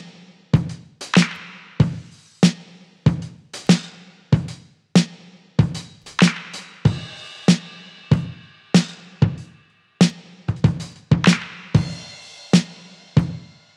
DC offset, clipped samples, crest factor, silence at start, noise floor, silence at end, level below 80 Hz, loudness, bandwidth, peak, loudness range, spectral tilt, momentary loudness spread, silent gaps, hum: under 0.1%; under 0.1%; 20 dB; 0 s; -53 dBFS; 0.4 s; -44 dBFS; -20 LUFS; 11.5 kHz; 0 dBFS; 2 LU; -5.5 dB/octave; 18 LU; none; none